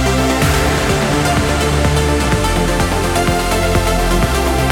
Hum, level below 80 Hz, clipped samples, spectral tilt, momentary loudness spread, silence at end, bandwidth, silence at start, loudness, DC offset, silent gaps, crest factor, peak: none; -20 dBFS; under 0.1%; -4.5 dB/octave; 2 LU; 0 s; 18 kHz; 0 s; -15 LUFS; under 0.1%; none; 10 dB; -2 dBFS